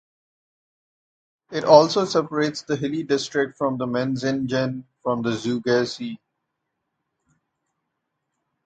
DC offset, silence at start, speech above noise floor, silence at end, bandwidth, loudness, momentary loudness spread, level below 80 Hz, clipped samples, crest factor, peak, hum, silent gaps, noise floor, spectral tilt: under 0.1%; 1.5 s; 57 dB; 2.5 s; 9 kHz; -22 LUFS; 14 LU; -64 dBFS; under 0.1%; 24 dB; 0 dBFS; none; none; -79 dBFS; -5.5 dB/octave